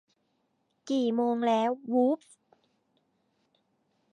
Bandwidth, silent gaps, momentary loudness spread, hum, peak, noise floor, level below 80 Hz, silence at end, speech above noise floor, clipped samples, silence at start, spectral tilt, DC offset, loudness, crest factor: 10.5 kHz; none; 5 LU; none; -14 dBFS; -75 dBFS; -88 dBFS; 1.95 s; 48 dB; under 0.1%; 0.85 s; -5.5 dB/octave; under 0.1%; -28 LUFS; 18 dB